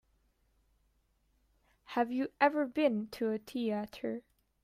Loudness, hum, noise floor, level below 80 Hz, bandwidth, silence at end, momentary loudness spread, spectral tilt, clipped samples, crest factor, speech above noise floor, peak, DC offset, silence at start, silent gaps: -34 LUFS; none; -74 dBFS; -72 dBFS; 15.5 kHz; 0.45 s; 10 LU; -6 dB/octave; under 0.1%; 22 dB; 41 dB; -12 dBFS; under 0.1%; 1.9 s; none